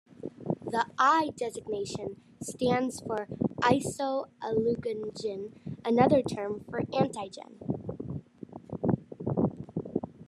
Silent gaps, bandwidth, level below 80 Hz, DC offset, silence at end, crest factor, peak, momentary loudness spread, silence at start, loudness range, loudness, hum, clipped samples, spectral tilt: none; 12.5 kHz; -64 dBFS; under 0.1%; 0 s; 22 dB; -10 dBFS; 17 LU; 0.1 s; 5 LU; -30 LUFS; none; under 0.1%; -6 dB/octave